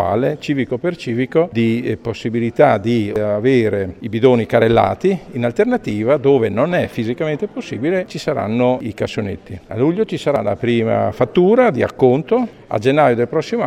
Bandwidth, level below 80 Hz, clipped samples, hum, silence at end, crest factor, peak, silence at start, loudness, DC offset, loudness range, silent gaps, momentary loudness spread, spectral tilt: 13 kHz; -48 dBFS; under 0.1%; none; 0 s; 16 dB; 0 dBFS; 0 s; -17 LUFS; under 0.1%; 4 LU; none; 9 LU; -7.5 dB/octave